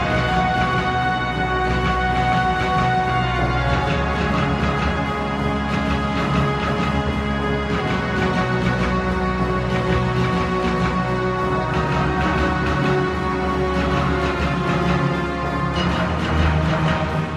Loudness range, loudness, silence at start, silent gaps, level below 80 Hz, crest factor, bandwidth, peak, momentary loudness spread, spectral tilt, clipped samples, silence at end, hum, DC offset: 1 LU; -20 LUFS; 0 s; none; -30 dBFS; 16 dB; 11.5 kHz; -4 dBFS; 3 LU; -6.5 dB/octave; under 0.1%; 0 s; none; under 0.1%